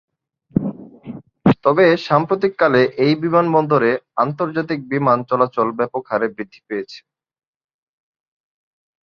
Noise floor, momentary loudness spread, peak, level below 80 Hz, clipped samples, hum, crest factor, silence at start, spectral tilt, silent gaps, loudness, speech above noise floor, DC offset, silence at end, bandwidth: -36 dBFS; 14 LU; 0 dBFS; -54 dBFS; under 0.1%; none; 18 dB; 0.55 s; -8 dB/octave; none; -18 LUFS; 19 dB; under 0.1%; 2.05 s; 7 kHz